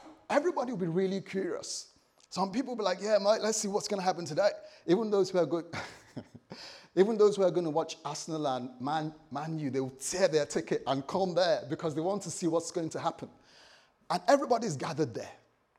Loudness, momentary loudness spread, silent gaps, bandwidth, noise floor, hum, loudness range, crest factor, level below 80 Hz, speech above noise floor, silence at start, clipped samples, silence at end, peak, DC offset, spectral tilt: -31 LUFS; 14 LU; none; 14 kHz; -61 dBFS; none; 3 LU; 20 dB; -74 dBFS; 30 dB; 0 s; under 0.1%; 0.45 s; -12 dBFS; under 0.1%; -4.5 dB/octave